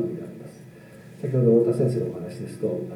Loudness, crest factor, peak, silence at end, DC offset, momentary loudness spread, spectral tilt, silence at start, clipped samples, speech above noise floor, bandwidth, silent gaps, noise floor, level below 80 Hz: -24 LUFS; 18 dB; -8 dBFS; 0 s; under 0.1%; 20 LU; -9.5 dB/octave; 0 s; under 0.1%; 23 dB; 12 kHz; none; -45 dBFS; -68 dBFS